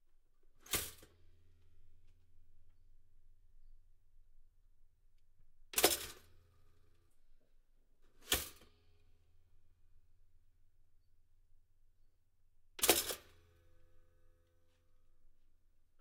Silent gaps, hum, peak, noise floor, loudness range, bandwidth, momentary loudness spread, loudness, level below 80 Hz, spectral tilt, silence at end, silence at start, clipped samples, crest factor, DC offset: none; none; -14 dBFS; -71 dBFS; 8 LU; 16 kHz; 18 LU; -35 LUFS; -64 dBFS; -1 dB/octave; 0.7 s; 0.65 s; under 0.1%; 32 dB; under 0.1%